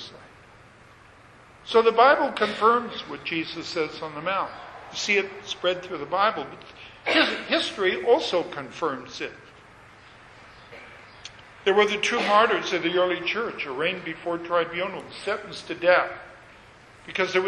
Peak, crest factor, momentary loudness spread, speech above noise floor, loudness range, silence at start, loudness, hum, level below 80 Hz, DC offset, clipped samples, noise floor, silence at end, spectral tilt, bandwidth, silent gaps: -4 dBFS; 22 dB; 21 LU; 27 dB; 5 LU; 0 s; -24 LUFS; none; -62 dBFS; under 0.1%; under 0.1%; -51 dBFS; 0 s; -3.5 dB/octave; 11 kHz; none